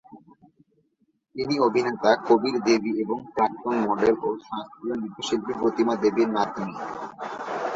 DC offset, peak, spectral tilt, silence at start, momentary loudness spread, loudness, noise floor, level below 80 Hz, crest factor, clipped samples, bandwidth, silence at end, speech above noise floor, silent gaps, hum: under 0.1%; -6 dBFS; -5 dB/octave; 0.1 s; 12 LU; -25 LUFS; -70 dBFS; -64 dBFS; 20 dB; under 0.1%; 7.8 kHz; 0 s; 46 dB; none; none